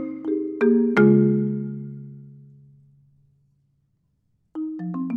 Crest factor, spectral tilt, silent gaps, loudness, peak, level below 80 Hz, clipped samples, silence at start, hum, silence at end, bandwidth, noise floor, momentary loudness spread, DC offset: 18 dB; -10 dB/octave; none; -21 LUFS; -4 dBFS; -66 dBFS; under 0.1%; 0 s; none; 0 s; 6 kHz; -69 dBFS; 22 LU; under 0.1%